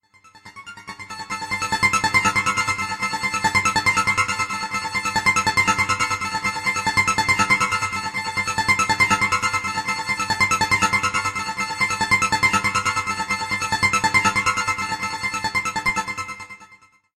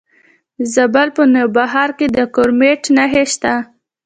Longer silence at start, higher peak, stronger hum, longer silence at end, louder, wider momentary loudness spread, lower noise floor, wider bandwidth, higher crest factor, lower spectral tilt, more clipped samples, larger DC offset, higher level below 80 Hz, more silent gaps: second, 0.35 s vs 0.6 s; second, -4 dBFS vs 0 dBFS; neither; about the same, 0.4 s vs 0.4 s; second, -20 LUFS vs -13 LUFS; about the same, 8 LU vs 6 LU; about the same, -52 dBFS vs -53 dBFS; first, 15.5 kHz vs 9.4 kHz; about the same, 18 dB vs 14 dB; second, -2 dB/octave vs -3.5 dB/octave; neither; neither; about the same, -48 dBFS vs -50 dBFS; neither